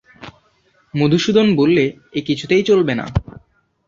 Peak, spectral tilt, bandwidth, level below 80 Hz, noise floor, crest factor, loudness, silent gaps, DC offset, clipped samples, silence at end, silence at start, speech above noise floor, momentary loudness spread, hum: -2 dBFS; -6.5 dB/octave; 7.6 kHz; -40 dBFS; -58 dBFS; 16 dB; -16 LUFS; none; under 0.1%; under 0.1%; 0.5 s; 0.2 s; 43 dB; 11 LU; none